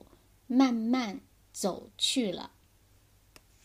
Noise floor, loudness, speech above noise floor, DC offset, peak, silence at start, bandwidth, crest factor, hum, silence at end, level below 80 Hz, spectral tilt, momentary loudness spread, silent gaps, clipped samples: -63 dBFS; -30 LUFS; 34 dB; under 0.1%; -12 dBFS; 0.5 s; 15.5 kHz; 20 dB; none; 1.15 s; -66 dBFS; -3.5 dB/octave; 19 LU; none; under 0.1%